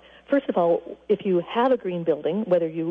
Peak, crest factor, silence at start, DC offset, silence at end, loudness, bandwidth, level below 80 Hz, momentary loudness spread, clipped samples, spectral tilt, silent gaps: -10 dBFS; 14 dB; 0.3 s; under 0.1%; 0 s; -24 LUFS; 4.7 kHz; -66 dBFS; 4 LU; under 0.1%; -9 dB/octave; none